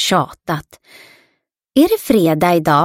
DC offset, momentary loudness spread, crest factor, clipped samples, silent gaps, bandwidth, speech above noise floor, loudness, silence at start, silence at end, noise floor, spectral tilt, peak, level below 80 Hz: under 0.1%; 11 LU; 16 dB; under 0.1%; none; 17 kHz; 51 dB; -15 LUFS; 0 s; 0 s; -66 dBFS; -5 dB/octave; 0 dBFS; -50 dBFS